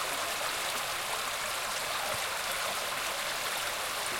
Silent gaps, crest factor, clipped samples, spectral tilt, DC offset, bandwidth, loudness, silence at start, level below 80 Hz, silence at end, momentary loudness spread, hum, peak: none; 16 dB; under 0.1%; 0 dB/octave; under 0.1%; 17 kHz; -32 LUFS; 0 s; -62 dBFS; 0 s; 1 LU; none; -18 dBFS